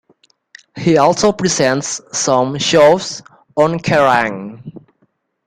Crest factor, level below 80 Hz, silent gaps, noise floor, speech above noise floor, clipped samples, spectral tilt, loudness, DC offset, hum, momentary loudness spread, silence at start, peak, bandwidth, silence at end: 16 dB; -50 dBFS; none; -62 dBFS; 48 dB; under 0.1%; -4 dB/octave; -14 LUFS; under 0.1%; none; 15 LU; 0.75 s; 0 dBFS; 12.5 kHz; 0.7 s